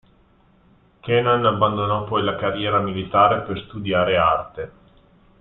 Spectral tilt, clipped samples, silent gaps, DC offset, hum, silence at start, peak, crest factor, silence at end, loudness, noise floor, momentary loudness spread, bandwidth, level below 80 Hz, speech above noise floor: -10.5 dB/octave; under 0.1%; none; under 0.1%; none; 1.05 s; -2 dBFS; 20 dB; 0.7 s; -20 LUFS; -56 dBFS; 13 LU; 4.1 kHz; -50 dBFS; 36 dB